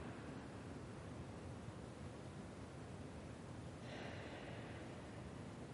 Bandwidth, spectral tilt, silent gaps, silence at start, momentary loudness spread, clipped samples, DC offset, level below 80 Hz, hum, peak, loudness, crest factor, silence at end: 11.5 kHz; -6 dB/octave; none; 0 s; 2 LU; under 0.1%; under 0.1%; -64 dBFS; none; -38 dBFS; -53 LUFS; 14 dB; 0 s